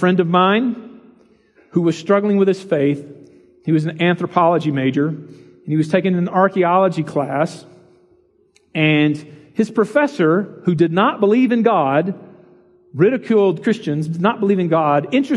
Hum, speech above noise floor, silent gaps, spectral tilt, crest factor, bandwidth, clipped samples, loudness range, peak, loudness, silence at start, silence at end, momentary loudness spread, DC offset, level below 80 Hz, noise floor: none; 41 dB; none; -7.5 dB/octave; 18 dB; 11.5 kHz; under 0.1%; 3 LU; 0 dBFS; -17 LUFS; 0 s; 0 s; 9 LU; under 0.1%; -68 dBFS; -57 dBFS